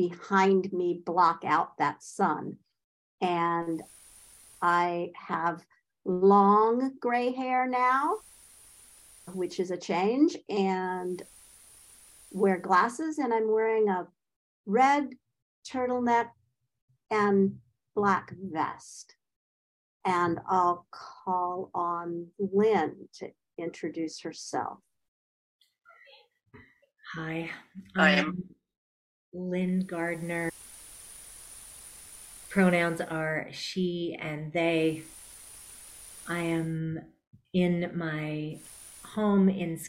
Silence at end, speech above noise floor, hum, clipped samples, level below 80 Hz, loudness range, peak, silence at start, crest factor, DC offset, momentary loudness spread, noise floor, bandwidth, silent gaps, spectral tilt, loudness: 0 s; 30 dB; none; under 0.1%; -68 dBFS; 8 LU; -10 dBFS; 0 s; 20 dB; under 0.1%; 21 LU; -58 dBFS; 16 kHz; 2.84-3.18 s, 14.36-14.64 s, 15.42-15.62 s, 16.82-16.88 s, 19.36-20.00 s, 25.08-25.59 s, 28.77-29.32 s, 37.27-37.31 s; -6 dB/octave; -28 LUFS